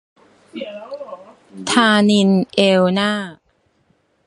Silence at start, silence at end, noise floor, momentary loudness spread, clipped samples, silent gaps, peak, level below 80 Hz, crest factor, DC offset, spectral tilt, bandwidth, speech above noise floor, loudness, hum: 0.55 s; 0.95 s; -62 dBFS; 20 LU; under 0.1%; none; 0 dBFS; -60 dBFS; 18 dB; under 0.1%; -5 dB/octave; 11.5 kHz; 45 dB; -15 LUFS; none